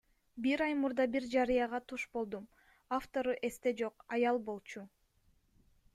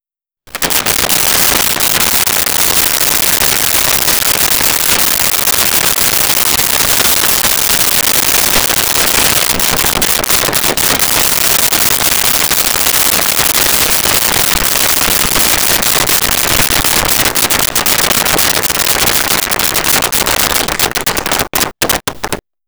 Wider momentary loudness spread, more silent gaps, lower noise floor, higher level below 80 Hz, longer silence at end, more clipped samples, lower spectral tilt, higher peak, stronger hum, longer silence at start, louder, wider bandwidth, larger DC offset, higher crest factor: first, 12 LU vs 3 LU; neither; first, -72 dBFS vs -46 dBFS; second, -66 dBFS vs -32 dBFS; first, 1.1 s vs 0.3 s; neither; first, -5 dB/octave vs -0.5 dB/octave; second, -20 dBFS vs 0 dBFS; neither; second, 0.35 s vs 0.5 s; second, -35 LUFS vs -8 LUFS; second, 14.5 kHz vs over 20 kHz; neither; about the same, 16 dB vs 12 dB